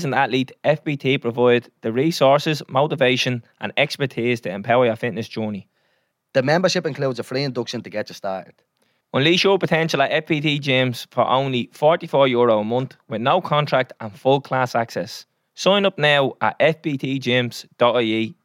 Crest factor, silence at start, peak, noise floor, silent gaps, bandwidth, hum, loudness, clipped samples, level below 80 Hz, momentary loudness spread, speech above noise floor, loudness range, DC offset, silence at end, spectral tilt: 16 dB; 0 s; -4 dBFS; -68 dBFS; none; 16.5 kHz; none; -20 LUFS; under 0.1%; -72 dBFS; 11 LU; 48 dB; 4 LU; under 0.1%; 0.15 s; -5.5 dB/octave